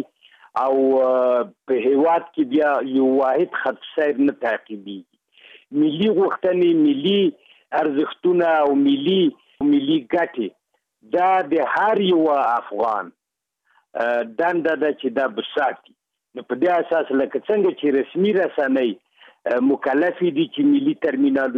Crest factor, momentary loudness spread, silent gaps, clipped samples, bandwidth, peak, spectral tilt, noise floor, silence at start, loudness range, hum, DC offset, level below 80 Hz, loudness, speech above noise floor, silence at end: 12 dB; 8 LU; none; under 0.1%; 5 kHz; -8 dBFS; -8 dB/octave; -75 dBFS; 0 s; 3 LU; none; under 0.1%; -68 dBFS; -20 LUFS; 56 dB; 0 s